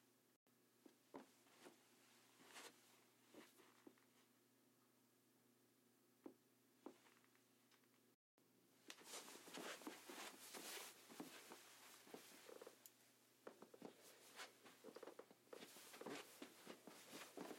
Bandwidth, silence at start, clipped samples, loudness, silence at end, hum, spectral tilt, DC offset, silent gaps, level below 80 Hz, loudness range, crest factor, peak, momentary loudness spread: 16.5 kHz; 0 s; under 0.1%; -60 LUFS; 0 s; none; -2 dB/octave; under 0.1%; 0.36-0.46 s, 8.14-8.38 s; under -90 dBFS; 11 LU; 26 dB; -36 dBFS; 12 LU